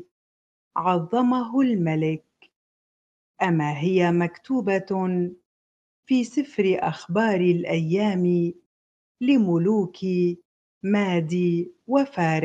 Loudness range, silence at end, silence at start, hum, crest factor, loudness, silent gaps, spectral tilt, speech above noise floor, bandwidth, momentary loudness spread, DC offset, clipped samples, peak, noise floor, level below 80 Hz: 2 LU; 0 s; 0.75 s; none; 18 dB; -23 LUFS; 2.56-3.34 s, 5.46-6.03 s, 8.66-9.15 s, 10.45-10.81 s; -7.5 dB/octave; over 68 dB; 8 kHz; 7 LU; under 0.1%; under 0.1%; -6 dBFS; under -90 dBFS; -68 dBFS